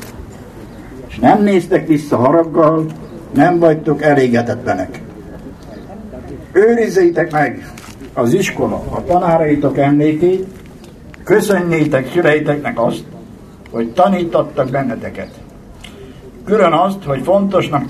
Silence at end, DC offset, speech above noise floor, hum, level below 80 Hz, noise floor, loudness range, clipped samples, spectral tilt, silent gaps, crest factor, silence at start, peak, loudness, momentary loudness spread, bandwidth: 0 s; under 0.1%; 23 dB; none; -42 dBFS; -36 dBFS; 4 LU; under 0.1%; -7 dB/octave; none; 14 dB; 0 s; 0 dBFS; -14 LUFS; 21 LU; 14 kHz